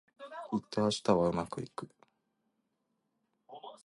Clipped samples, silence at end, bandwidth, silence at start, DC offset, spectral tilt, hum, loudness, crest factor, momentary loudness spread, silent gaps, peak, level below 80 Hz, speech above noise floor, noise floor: under 0.1%; 0.1 s; 11.5 kHz; 0.2 s; under 0.1%; -5.5 dB/octave; none; -33 LUFS; 24 dB; 22 LU; none; -12 dBFS; -64 dBFS; 49 dB; -81 dBFS